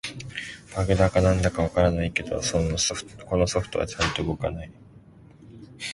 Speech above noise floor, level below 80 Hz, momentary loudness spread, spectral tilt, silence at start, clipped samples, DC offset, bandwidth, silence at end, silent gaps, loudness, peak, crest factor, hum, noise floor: 26 dB; -38 dBFS; 14 LU; -4.5 dB/octave; 0.05 s; under 0.1%; under 0.1%; 11.5 kHz; 0 s; none; -25 LUFS; -6 dBFS; 18 dB; none; -50 dBFS